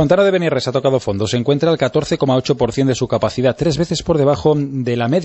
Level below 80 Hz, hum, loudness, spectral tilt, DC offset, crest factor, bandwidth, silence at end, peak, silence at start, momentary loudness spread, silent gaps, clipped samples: -42 dBFS; none; -16 LUFS; -6 dB/octave; under 0.1%; 14 dB; 8.4 kHz; 0 s; -2 dBFS; 0 s; 4 LU; none; under 0.1%